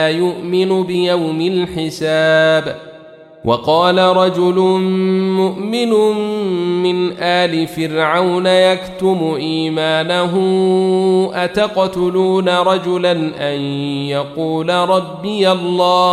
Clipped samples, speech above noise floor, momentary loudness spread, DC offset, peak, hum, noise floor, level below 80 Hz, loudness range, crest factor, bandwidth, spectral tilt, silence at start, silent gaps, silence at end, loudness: under 0.1%; 24 dB; 7 LU; under 0.1%; -2 dBFS; none; -39 dBFS; -54 dBFS; 2 LU; 14 dB; 13.5 kHz; -6 dB/octave; 0 s; none; 0 s; -15 LUFS